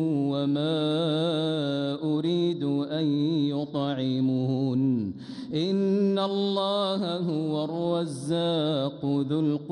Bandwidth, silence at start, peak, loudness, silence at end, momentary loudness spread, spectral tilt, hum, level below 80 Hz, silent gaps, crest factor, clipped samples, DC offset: 10.5 kHz; 0 s; -14 dBFS; -27 LUFS; 0 s; 4 LU; -7.5 dB/octave; none; -70 dBFS; none; 12 dB; under 0.1%; under 0.1%